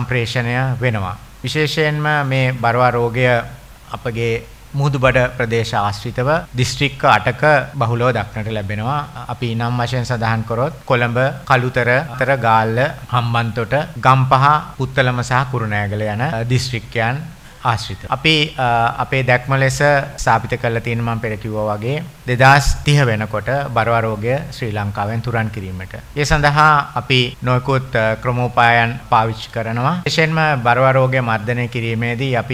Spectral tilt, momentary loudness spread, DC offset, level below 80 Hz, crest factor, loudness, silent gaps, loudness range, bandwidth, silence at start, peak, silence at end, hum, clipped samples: -5.5 dB/octave; 9 LU; under 0.1%; -36 dBFS; 16 dB; -17 LUFS; none; 3 LU; 15.5 kHz; 0 s; 0 dBFS; 0 s; none; under 0.1%